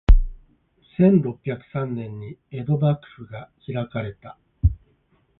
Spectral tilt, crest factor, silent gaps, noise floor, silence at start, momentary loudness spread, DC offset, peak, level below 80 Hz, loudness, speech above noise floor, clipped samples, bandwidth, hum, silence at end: -11 dB/octave; 22 dB; none; -63 dBFS; 0.1 s; 21 LU; under 0.1%; -2 dBFS; -26 dBFS; -24 LUFS; 40 dB; under 0.1%; 4 kHz; none; 0.65 s